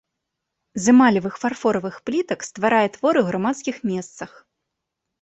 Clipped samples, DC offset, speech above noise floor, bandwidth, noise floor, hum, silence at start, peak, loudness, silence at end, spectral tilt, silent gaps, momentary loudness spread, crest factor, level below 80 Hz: under 0.1%; under 0.1%; 61 dB; 8.2 kHz; -81 dBFS; none; 0.75 s; -4 dBFS; -20 LUFS; 0.95 s; -5 dB/octave; none; 15 LU; 18 dB; -62 dBFS